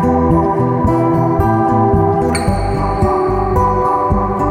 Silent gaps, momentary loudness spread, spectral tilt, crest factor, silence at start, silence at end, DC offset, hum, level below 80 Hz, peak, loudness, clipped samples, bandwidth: none; 3 LU; -8 dB/octave; 12 dB; 0 s; 0 s; under 0.1%; none; -24 dBFS; -2 dBFS; -14 LUFS; under 0.1%; 14.5 kHz